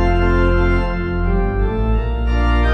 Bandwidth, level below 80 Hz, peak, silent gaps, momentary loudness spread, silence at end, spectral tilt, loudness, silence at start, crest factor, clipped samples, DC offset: 6 kHz; -18 dBFS; -4 dBFS; none; 4 LU; 0 s; -8.5 dB/octave; -18 LUFS; 0 s; 10 dB; under 0.1%; under 0.1%